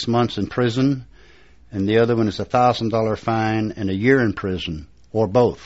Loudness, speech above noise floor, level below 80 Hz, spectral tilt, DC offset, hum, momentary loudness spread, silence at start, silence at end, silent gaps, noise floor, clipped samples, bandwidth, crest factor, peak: -20 LUFS; 31 dB; -48 dBFS; -5.5 dB/octave; 0.3%; none; 10 LU; 0 s; 0 s; none; -50 dBFS; under 0.1%; 8 kHz; 18 dB; -2 dBFS